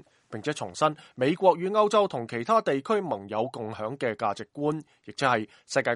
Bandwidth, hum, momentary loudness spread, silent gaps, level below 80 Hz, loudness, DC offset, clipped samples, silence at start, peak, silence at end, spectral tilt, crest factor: 11.5 kHz; none; 11 LU; none; -72 dBFS; -27 LUFS; under 0.1%; under 0.1%; 0.3 s; -8 dBFS; 0 s; -5 dB/octave; 20 dB